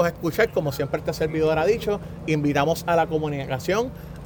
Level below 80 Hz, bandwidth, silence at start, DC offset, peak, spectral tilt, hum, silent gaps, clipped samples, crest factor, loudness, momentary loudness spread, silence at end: -44 dBFS; over 20 kHz; 0 s; under 0.1%; -6 dBFS; -6 dB/octave; none; none; under 0.1%; 18 dB; -24 LUFS; 6 LU; 0 s